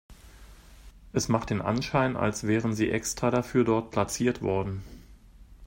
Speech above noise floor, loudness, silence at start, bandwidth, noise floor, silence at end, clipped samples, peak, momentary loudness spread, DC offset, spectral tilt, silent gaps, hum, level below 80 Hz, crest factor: 25 dB; -27 LUFS; 0.1 s; 16.5 kHz; -51 dBFS; 0 s; under 0.1%; -8 dBFS; 6 LU; under 0.1%; -5.5 dB/octave; none; none; -50 dBFS; 20 dB